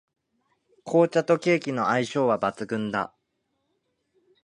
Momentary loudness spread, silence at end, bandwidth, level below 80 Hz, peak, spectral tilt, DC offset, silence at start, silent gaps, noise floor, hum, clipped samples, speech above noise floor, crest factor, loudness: 9 LU; 1.4 s; 10.5 kHz; -70 dBFS; -8 dBFS; -6 dB/octave; under 0.1%; 0.85 s; none; -76 dBFS; none; under 0.1%; 52 dB; 20 dB; -24 LUFS